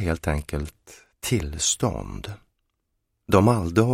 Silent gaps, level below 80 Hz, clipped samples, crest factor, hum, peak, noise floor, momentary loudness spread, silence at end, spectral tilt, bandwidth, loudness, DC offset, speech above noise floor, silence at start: none; -38 dBFS; under 0.1%; 22 dB; none; -2 dBFS; -76 dBFS; 18 LU; 0 s; -5 dB/octave; 16.5 kHz; -24 LUFS; under 0.1%; 53 dB; 0 s